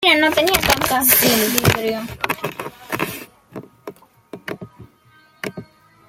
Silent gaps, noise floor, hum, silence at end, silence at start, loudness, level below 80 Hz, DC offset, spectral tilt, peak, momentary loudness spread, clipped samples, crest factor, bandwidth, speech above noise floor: none; -53 dBFS; none; 0.45 s; 0 s; -16 LUFS; -44 dBFS; under 0.1%; -3 dB/octave; 0 dBFS; 25 LU; under 0.1%; 20 dB; 16.5 kHz; 36 dB